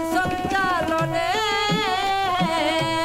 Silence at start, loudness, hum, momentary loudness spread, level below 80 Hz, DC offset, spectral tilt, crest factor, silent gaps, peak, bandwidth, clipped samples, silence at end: 0 s; -22 LUFS; none; 2 LU; -46 dBFS; under 0.1%; -4 dB/octave; 12 dB; none; -10 dBFS; 16 kHz; under 0.1%; 0 s